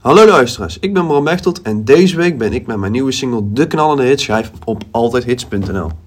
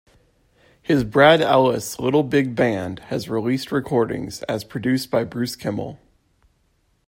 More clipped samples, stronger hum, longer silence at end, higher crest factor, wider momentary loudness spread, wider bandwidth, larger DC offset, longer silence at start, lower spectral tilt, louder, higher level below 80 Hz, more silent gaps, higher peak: first, 0.8% vs under 0.1%; neither; second, 0.05 s vs 1.1 s; second, 12 dB vs 20 dB; second, 10 LU vs 13 LU; about the same, 16 kHz vs 16.5 kHz; neither; second, 0.05 s vs 0.9 s; about the same, -5.5 dB/octave vs -5.5 dB/octave; first, -13 LUFS vs -20 LUFS; first, -38 dBFS vs -52 dBFS; neither; about the same, 0 dBFS vs -2 dBFS